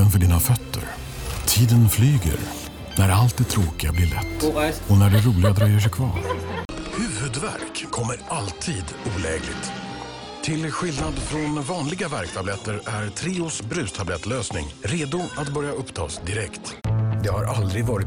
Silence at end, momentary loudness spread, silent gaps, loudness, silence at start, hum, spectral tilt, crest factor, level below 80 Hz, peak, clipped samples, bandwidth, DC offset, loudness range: 0 s; 12 LU; 6.65-6.69 s; -23 LUFS; 0 s; none; -5 dB/octave; 16 dB; -36 dBFS; -8 dBFS; under 0.1%; over 20 kHz; under 0.1%; 7 LU